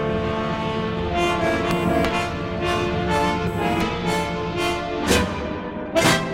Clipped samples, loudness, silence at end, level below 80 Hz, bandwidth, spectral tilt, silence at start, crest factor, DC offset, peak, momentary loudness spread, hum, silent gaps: under 0.1%; -22 LUFS; 0 s; -36 dBFS; 16.5 kHz; -5 dB/octave; 0 s; 18 dB; under 0.1%; -4 dBFS; 5 LU; none; none